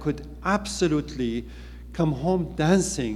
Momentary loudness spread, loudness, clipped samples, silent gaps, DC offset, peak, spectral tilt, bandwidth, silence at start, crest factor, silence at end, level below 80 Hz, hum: 13 LU; -25 LUFS; under 0.1%; none; under 0.1%; -6 dBFS; -5.5 dB/octave; 14 kHz; 0 s; 18 dB; 0 s; -40 dBFS; none